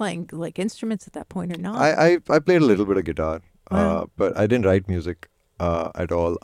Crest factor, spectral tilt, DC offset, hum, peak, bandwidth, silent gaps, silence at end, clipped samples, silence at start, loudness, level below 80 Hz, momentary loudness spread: 18 dB; -7 dB/octave; under 0.1%; none; -4 dBFS; 13 kHz; none; 0.05 s; under 0.1%; 0 s; -22 LUFS; -44 dBFS; 14 LU